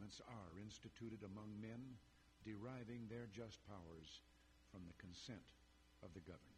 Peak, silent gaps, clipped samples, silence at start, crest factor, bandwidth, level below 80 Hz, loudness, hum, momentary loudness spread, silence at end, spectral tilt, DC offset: -42 dBFS; none; under 0.1%; 0 s; 16 dB; 13 kHz; -74 dBFS; -57 LUFS; none; 8 LU; 0 s; -5.5 dB/octave; under 0.1%